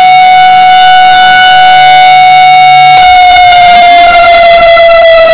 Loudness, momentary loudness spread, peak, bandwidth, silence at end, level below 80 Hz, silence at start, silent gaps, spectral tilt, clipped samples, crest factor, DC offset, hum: -1 LUFS; 1 LU; 0 dBFS; 4 kHz; 0 s; -32 dBFS; 0 s; none; -5.5 dB/octave; 40%; 0 dB; under 0.1%; none